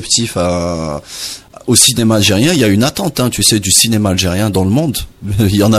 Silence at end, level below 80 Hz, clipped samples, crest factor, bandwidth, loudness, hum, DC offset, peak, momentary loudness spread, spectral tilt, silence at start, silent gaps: 0 s; -36 dBFS; under 0.1%; 12 dB; 16 kHz; -12 LUFS; none; under 0.1%; 0 dBFS; 14 LU; -3.5 dB/octave; 0 s; none